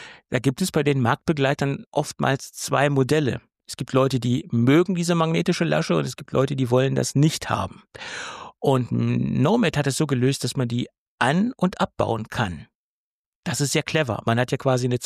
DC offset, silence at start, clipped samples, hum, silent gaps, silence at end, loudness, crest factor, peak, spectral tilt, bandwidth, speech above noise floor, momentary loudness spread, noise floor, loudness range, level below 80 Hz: under 0.1%; 0 s; under 0.1%; none; 1.86-1.92 s, 10.98-11.18 s, 12.75-13.43 s; 0 s; -22 LUFS; 16 dB; -6 dBFS; -5.5 dB/octave; 15 kHz; over 68 dB; 9 LU; under -90 dBFS; 4 LU; -54 dBFS